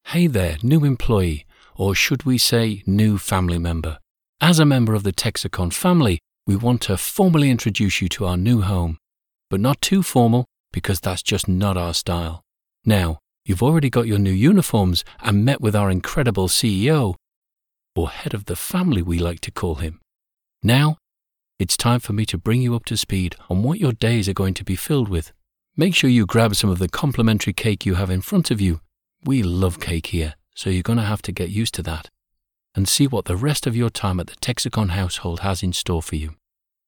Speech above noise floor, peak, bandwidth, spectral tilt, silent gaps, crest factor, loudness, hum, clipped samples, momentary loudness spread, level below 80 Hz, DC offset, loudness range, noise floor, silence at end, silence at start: 66 dB; -2 dBFS; 19 kHz; -5.5 dB/octave; 4.11-4.15 s, 4.29-4.33 s, 10.60-10.64 s, 17.36-17.42 s; 16 dB; -20 LUFS; none; under 0.1%; 10 LU; -38 dBFS; under 0.1%; 4 LU; -85 dBFS; 0.55 s; 0.05 s